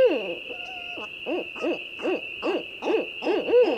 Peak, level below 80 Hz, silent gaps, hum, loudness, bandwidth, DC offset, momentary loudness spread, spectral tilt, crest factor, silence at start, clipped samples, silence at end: -12 dBFS; -68 dBFS; none; none; -28 LUFS; 8.2 kHz; under 0.1%; 11 LU; -4.5 dB/octave; 14 dB; 0 s; under 0.1%; 0 s